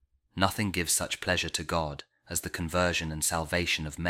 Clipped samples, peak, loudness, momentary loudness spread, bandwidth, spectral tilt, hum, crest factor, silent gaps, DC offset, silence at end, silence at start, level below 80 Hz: under 0.1%; -8 dBFS; -29 LUFS; 7 LU; 17 kHz; -3 dB/octave; none; 24 dB; none; under 0.1%; 0 s; 0.35 s; -48 dBFS